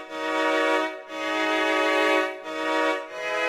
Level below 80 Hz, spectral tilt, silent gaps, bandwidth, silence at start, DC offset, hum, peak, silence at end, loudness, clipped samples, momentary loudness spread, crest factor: -68 dBFS; -1.5 dB/octave; none; 15.5 kHz; 0 s; under 0.1%; none; -10 dBFS; 0 s; -24 LUFS; under 0.1%; 8 LU; 14 dB